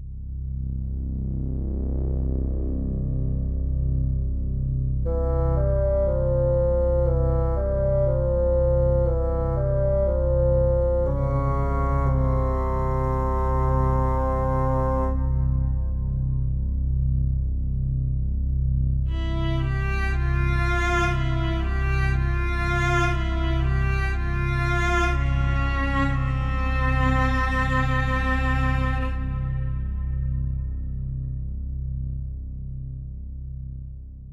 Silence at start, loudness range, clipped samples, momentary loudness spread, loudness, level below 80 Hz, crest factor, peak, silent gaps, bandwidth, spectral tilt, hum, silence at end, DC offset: 0 s; 6 LU; under 0.1%; 9 LU; -25 LUFS; -26 dBFS; 14 dB; -10 dBFS; none; 7.4 kHz; -8 dB/octave; none; 0 s; under 0.1%